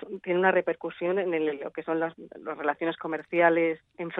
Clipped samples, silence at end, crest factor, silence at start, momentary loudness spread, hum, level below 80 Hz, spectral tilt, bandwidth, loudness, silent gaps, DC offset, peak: under 0.1%; 0 s; 20 dB; 0 s; 12 LU; none; -76 dBFS; -8.5 dB/octave; 4 kHz; -27 LUFS; none; under 0.1%; -8 dBFS